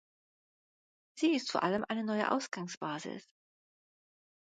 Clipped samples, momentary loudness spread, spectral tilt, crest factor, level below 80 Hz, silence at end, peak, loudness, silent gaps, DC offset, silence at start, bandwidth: under 0.1%; 10 LU; -4.5 dB/octave; 22 dB; -80 dBFS; 1.4 s; -16 dBFS; -34 LUFS; 2.77-2.81 s; under 0.1%; 1.15 s; 9.4 kHz